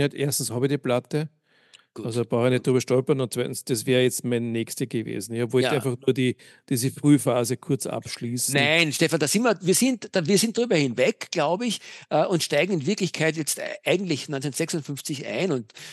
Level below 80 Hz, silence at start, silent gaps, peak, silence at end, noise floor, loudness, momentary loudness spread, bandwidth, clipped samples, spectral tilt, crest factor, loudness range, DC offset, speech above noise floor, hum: -74 dBFS; 0 s; none; -4 dBFS; 0 s; -57 dBFS; -24 LUFS; 9 LU; 12.5 kHz; under 0.1%; -4.5 dB/octave; 20 dB; 4 LU; under 0.1%; 33 dB; none